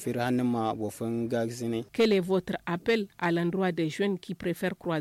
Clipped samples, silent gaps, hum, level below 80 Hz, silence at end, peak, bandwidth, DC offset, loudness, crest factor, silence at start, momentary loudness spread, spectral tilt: under 0.1%; none; none; -64 dBFS; 0 s; -16 dBFS; 16 kHz; under 0.1%; -29 LUFS; 12 dB; 0 s; 7 LU; -6 dB/octave